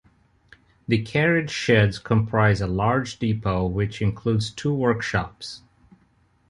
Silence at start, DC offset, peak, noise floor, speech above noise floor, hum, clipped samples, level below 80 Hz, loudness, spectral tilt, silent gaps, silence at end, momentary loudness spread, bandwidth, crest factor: 0.9 s; under 0.1%; -6 dBFS; -62 dBFS; 40 dB; none; under 0.1%; -44 dBFS; -23 LUFS; -6.5 dB/octave; none; 0.9 s; 8 LU; 11 kHz; 18 dB